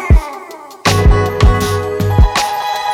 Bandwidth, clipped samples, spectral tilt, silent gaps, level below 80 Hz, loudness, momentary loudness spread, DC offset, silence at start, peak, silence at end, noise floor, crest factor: 16 kHz; under 0.1%; -5 dB/octave; none; -16 dBFS; -13 LUFS; 11 LU; under 0.1%; 0 s; -2 dBFS; 0 s; -31 dBFS; 10 dB